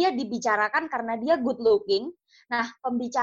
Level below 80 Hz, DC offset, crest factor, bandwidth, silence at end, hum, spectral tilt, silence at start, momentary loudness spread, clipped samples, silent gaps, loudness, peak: -66 dBFS; under 0.1%; 14 dB; 7.8 kHz; 0 s; none; -4 dB/octave; 0 s; 7 LU; under 0.1%; none; -26 LUFS; -10 dBFS